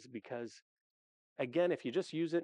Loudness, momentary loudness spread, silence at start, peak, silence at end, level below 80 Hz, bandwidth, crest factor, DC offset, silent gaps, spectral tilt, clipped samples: -37 LUFS; 14 LU; 0 s; -22 dBFS; 0 s; under -90 dBFS; 10 kHz; 16 dB; under 0.1%; 0.62-1.36 s; -6 dB/octave; under 0.1%